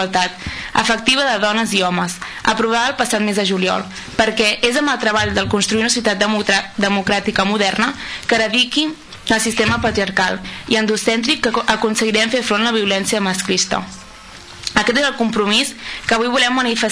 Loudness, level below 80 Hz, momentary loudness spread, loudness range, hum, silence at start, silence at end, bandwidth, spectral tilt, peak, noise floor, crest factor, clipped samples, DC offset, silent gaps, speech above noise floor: -16 LUFS; -44 dBFS; 7 LU; 1 LU; none; 0 s; 0 s; 11 kHz; -3 dB/octave; -2 dBFS; -37 dBFS; 14 dB; under 0.1%; under 0.1%; none; 20 dB